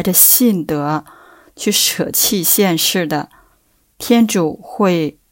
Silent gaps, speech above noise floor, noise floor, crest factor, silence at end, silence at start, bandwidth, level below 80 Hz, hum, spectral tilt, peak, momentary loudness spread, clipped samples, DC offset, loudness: none; 43 dB; -58 dBFS; 16 dB; 0.2 s; 0 s; 17 kHz; -54 dBFS; none; -3 dB/octave; 0 dBFS; 14 LU; under 0.1%; under 0.1%; -14 LUFS